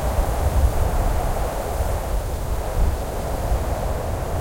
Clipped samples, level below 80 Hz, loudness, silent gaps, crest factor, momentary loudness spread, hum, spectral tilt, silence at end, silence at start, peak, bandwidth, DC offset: under 0.1%; -24 dBFS; -24 LUFS; none; 16 dB; 6 LU; none; -6 dB/octave; 0 s; 0 s; -6 dBFS; 16.5 kHz; under 0.1%